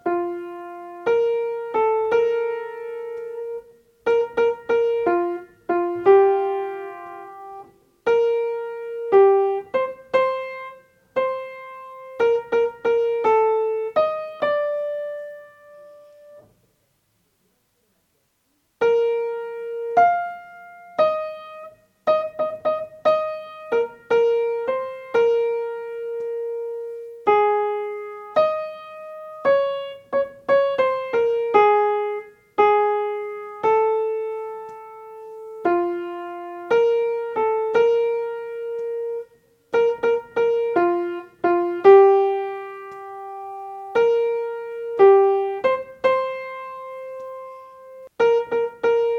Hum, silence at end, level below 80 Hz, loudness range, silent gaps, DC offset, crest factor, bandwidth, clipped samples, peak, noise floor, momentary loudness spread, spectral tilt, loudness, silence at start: none; 0 s; -68 dBFS; 6 LU; none; under 0.1%; 20 dB; 6.8 kHz; under 0.1%; -2 dBFS; -68 dBFS; 18 LU; -6 dB/octave; -21 LUFS; 0.05 s